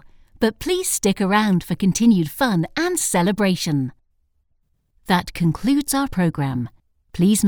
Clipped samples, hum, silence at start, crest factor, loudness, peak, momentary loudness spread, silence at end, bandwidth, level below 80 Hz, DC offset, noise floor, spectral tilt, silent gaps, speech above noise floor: under 0.1%; none; 0.4 s; 16 dB; -20 LUFS; -4 dBFS; 7 LU; 0 s; over 20 kHz; -44 dBFS; under 0.1%; -66 dBFS; -5 dB/octave; none; 47 dB